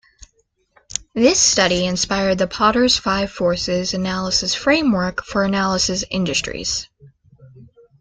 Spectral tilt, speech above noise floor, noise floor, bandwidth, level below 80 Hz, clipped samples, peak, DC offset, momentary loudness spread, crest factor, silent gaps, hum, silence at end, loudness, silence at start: -3 dB/octave; 45 dB; -64 dBFS; 10 kHz; -44 dBFS; under 0.1%; -2 dBFS; under 0.1%; 9 LU; 18 dB; none; none; 0.35 s; -18 LUFS; 1.15 s